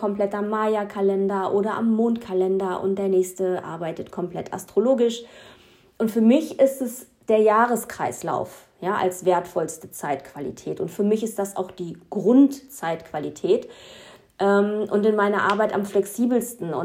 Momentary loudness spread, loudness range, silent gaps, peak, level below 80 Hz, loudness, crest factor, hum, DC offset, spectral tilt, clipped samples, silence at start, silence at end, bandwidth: 12 LU; 4 LU; none; -4 dBFS; -66 dBFS; -23 LUFS; 18 dB; none; under 0.1%; -6 dB/octave; under 0.1%; 0 s; 0 s; 16 kHz